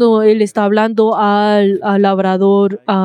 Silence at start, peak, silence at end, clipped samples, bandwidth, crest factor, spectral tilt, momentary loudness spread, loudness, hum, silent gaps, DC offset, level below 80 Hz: 0 s; 0 dBFS; 0 s; under 0.1%; 10.5 kHz; 10 dB; -7 dB/octave; 2 LU; -12 LUFS; none; none; under 0.1%; -72 dBFS